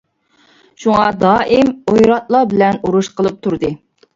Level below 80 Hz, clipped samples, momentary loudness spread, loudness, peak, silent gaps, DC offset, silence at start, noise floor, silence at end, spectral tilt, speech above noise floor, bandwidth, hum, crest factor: -46 dBFS; under 0.1%; 9 LU; -14 LUFS; 0 dBFS; none; under 0.1%; 0.8 s; -54 dBFS; 0.4 s; -6.5 dB/octave; 41 dB; 7.8 kHz; none; 14 dB